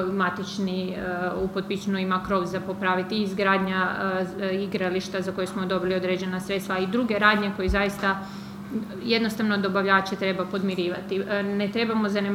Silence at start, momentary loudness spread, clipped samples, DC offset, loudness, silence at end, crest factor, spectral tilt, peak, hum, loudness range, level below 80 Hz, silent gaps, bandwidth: 0 s; 7 LU; under 0.1%; under 0.1%; -25 LUFS; 0 s; 22 dB; -6 dB/octave; -4 dBFS; none; 2 LU; -46 dBFS; none; 16 kHz